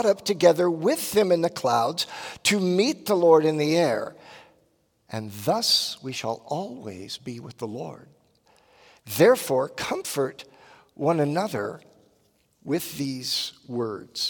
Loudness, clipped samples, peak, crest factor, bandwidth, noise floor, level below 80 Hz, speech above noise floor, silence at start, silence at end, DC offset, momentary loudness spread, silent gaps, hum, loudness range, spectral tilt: -24 LUFS; under 0.1%; -4 dBFS; 20 dB; 18 kHz; -67 dBFS; -70 dBFS; 43 dB; 0 s; 0 s; under 0.1%; 16 LU; none; none; 7 LU; -4 dB/octave